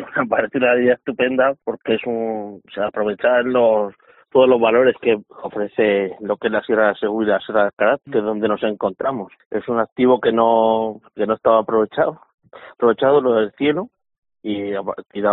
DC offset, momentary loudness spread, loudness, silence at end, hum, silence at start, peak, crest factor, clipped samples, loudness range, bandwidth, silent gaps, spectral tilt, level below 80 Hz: under 0.1%; 11 LU; -18 LUFS; 0 s; none; 0 s; -2 dBFS; 16 dB; under 0.1%; 2 LU; 4.1 kHz; 7.73-7.77 s, 9.46-9.51 s, 9.92-9.96 s, 12.34-12.38 s, 14.18-14.22 s; -3.5 dB/octave; -60 dBFS